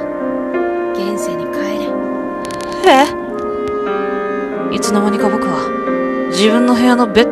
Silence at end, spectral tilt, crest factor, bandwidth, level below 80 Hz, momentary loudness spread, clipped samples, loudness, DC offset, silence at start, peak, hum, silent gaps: 0 s; -4.5 dB/octave; 14 dB; 14.5 kHz; -46 dBFS; 9 LU; under 0.1%; -15 LUFS; under 0.1%; 0 s; 0 dBFS; none; none